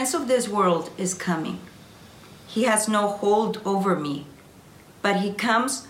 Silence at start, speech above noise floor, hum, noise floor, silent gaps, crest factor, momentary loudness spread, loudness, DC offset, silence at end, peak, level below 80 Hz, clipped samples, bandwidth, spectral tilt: 0 s; 25 dB; none; -49 dBFS; none; 16 dB; 10 LU; -24 LUFS; under 0.1%; 0 s; -8 dBFS; -64 dBFS; under 0.1%; 17 kHz; -4 dB/octave